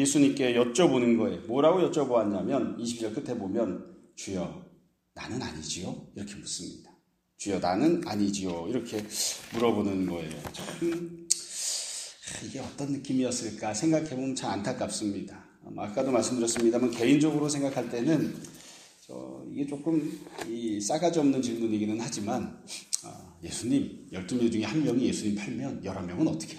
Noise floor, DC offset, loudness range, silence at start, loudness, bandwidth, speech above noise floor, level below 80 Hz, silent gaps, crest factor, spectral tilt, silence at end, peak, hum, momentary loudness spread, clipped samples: -64 dBFS; under 0.1%; 7 LU; 0 s; -29 LUFS; 15.5 kHz; 35 dB; -64 dBFS; none; 26 dB; -4.5 dB/octave; 0 s; -4 dBFS; none; 15 LU; under 0.1%